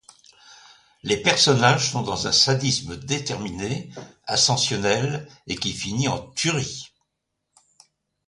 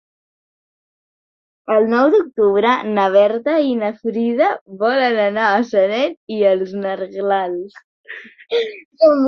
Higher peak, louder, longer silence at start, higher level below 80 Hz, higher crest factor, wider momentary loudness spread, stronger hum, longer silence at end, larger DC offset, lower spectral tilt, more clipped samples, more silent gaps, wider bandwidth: about the same, -2 dBFS vs -2 dBFS; second, -21 LUFS vs -17 LUFS; second, 0.5 s vs 1.7 s; first, -52 dBFS vs -66 dBFS; first, 22 dB vs 16 dB; first, 15 LU vs 12 LU; neither; first, 1.4 s vs 0 s; neither; second, -3 dB/octave vs -6.5 dB/octave; neither; second, none vs 4.61-4.66 s, 6.17-6.27 s, 7.84-8.04 s, 8.85-8.91 s; first, 11.5 kHz vs 6.6 kHz